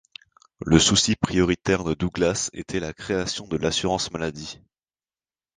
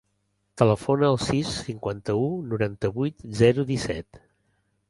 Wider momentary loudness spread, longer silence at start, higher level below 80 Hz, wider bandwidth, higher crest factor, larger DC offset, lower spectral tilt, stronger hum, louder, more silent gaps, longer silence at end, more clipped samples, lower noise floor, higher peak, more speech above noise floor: about the same, 12 LU vs 10 LU; about the same, 0.6 s vs 0.55 s; first, -44 dBFS vs -50 dBFS; second, 10 kHz vs 11.5 kHz; about the same, 24 dB vs 22 dB; neither; second, -4 dB/octave vs -6.5 dB/octave; neither; about the same, -23 LUFS vs -25 LUFS; neither; first, 1 s vs 0.7 s; neither; first, under -90 dBFS vs -73 dBFS; first, 0 dBFS vs -4 dBFS; first, over 67 dB vs 49 dB